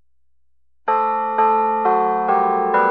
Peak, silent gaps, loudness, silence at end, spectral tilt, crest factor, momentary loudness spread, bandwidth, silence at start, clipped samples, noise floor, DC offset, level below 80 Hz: -6 dBFS; none; -18 LUFS; 0 s; -4 dB/octave; 14 dB; 3 LU; 5.4 kHz; 0.85 s; under 0.1%; -74 dBFS; 0.2%; -74 dBFS